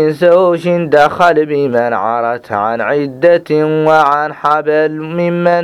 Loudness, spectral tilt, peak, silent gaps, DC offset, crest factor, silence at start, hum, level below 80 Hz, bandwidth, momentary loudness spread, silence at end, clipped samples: -12 LUFS; -7 dB/octave; 0 dBFS; none; under 0.1%; 12 dB; 0 s; none; -54 dBFS; 12 kHz; 7 LU; 0 s; 0.3%